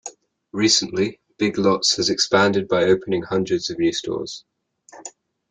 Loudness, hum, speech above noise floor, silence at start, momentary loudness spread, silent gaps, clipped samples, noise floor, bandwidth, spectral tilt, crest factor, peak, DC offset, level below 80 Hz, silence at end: -20 LUFS; none; 30 dB; 0.05 s; 20 LU; none; under 0.1%; -50 dBFS; 9.6 kHz; -3.5 dB/octave; 18 dB; -4 dBFS; under 0.1%; -58 dBFS; 0.4 s